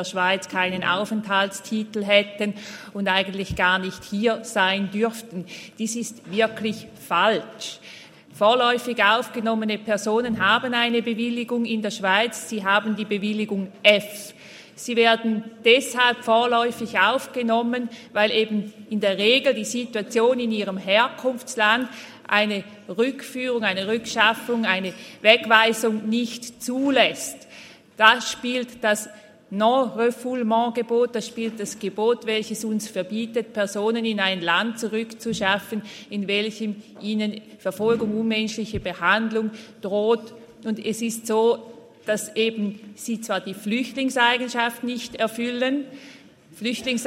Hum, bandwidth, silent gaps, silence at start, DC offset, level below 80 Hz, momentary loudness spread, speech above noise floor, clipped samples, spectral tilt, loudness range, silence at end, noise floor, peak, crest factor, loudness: none; 16 kHz; none; 0 s; under 0.1%; -60 dBFS; 12 LU; 23 dB; under 0.1%; -3.5 dB/octave; 5 LU; 0 s; -46 dBFS; 0 dBFS; 24 dB; -22 LUFS